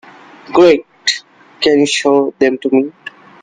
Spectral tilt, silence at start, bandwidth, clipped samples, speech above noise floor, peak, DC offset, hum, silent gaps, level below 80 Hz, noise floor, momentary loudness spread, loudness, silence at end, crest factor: -3.5 dB/octave; 0.5 s; 9.8 kHz; under 0.1%; 20 dB; 0 dBFS; under 0.1%; none; none; -56 dBFS; -32 dBFS; 13 LU; -13 LUFS; 0.35 s; 14 dB